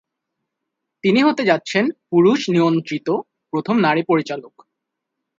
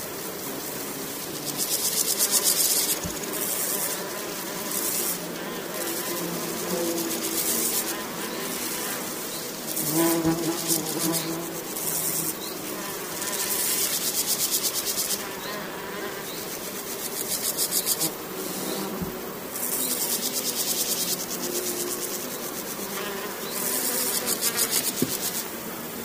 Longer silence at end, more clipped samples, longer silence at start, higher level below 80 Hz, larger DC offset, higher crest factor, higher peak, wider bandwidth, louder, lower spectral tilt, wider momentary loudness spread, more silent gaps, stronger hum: first, 0.95 s vs 0 s; neither; first, 1.05 s vs 0 s; second, -66 dBFS vs -60 dBFS; neither; about the same, 18 dB vs 22 dB; first, -2 dBFS vs -6 dBFS; second, 7.8 kHz vs over 20 kHz; first, -18 LUFS vs -26 LUFS; first, -6 dB/octave vs -1.5 dB/octave; about the same, 10 LU vs 9 LU; neither; neither